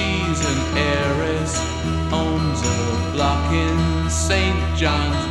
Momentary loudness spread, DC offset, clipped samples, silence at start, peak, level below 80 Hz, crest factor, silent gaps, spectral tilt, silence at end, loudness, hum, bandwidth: 3 LU; 0.1%; under 0.1%; 0 s; -4 dBFS; -28 dBFS; 16 dB; none; -5 dB/octave; 0 s; -20 LUFS; none; 12 kHz